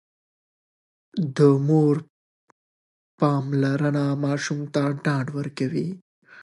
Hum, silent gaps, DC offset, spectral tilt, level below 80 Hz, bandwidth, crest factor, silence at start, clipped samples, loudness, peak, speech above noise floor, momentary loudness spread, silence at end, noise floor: none; 2.10-3.18 s, 6.02-6.22 s; under 0.1%; -7.5 dB/octave; -70 dBFS; 11 kHz; 20 dB; 1.15 s; under 0.1%; -23 LUFS; -6 dBFS; over 68 dB; 11 LU; 0 s; under -90 dBFS